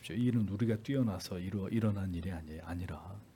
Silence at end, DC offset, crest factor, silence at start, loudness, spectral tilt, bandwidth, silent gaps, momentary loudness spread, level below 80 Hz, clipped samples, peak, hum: 0.1 s; under 0.1%; 16 dB; 0 s; -36 LUFS; -7.5 dB/octave; 17.5 kHz; none; 11 LU; -60 dBFS; under 0.1%; -18 dBFS; none